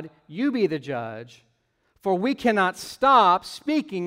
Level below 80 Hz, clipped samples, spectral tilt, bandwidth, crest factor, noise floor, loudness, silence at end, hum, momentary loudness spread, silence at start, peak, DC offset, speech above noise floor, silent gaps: -62 dBFS; under 0.1%; -5 dB/octave; 16 kHz; 20 dB; -68 dBFS; -23 LUFS; 0 s; none; 15 LU; 0 s; -4 dBFS; under 0.1%; 46 dB; none